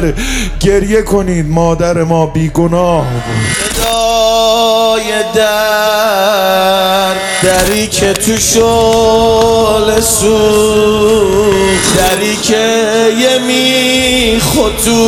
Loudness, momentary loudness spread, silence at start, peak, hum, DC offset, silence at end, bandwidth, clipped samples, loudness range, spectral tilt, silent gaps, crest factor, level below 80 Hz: -9 LUFS; 4 LU; 0 s; 0 dBFS; none; under 0.1%; 0 s; 19 kHz; under 0.1%; 3 LU; -3.5 dB/octave; none; 10 dB; -26 dBFS